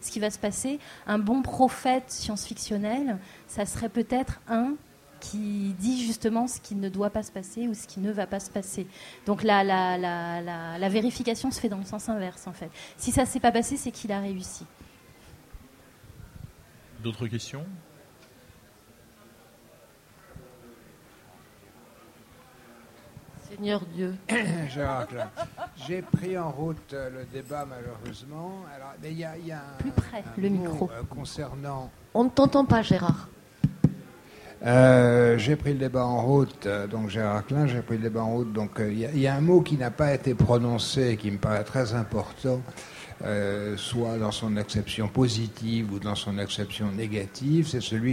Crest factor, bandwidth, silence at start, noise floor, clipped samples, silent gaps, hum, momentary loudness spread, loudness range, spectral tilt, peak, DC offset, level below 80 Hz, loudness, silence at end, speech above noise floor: 24 dB; 16 kHz; 0 s; -55 dBFS; under 0.1%; none; none; 16 LU; 15 LU; -6 dB/octave; -4 dBFS; under 0.1%; -50 dBFS; -27 LUFS; 0 s; 28 dB